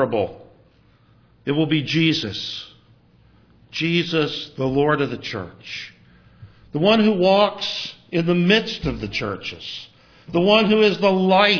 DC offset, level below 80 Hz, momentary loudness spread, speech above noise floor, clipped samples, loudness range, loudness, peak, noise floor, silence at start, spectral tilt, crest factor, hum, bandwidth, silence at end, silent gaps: under 0.1%; -50 dBFS; 16 LU; 36 dB; under 0.1%; 4 LU; -20 LUFS; -2 dBFS; -55 dBFS; 0 s; -6 dB/octave; 20 dB; none; 5.4 kHz; 0 s; none